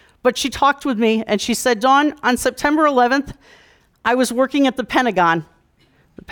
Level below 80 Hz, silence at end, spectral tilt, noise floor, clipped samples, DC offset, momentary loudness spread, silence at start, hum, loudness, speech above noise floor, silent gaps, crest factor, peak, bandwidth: -48 dBFS; 0 s; -3.5 dB/octave; -57 dBFS; under 0.1%; under 0.1%; 6 LU; 0.25 s; none; -17 LUFS; 40 dB; none; 14 dB; -4 dBFS; 19.5 kHz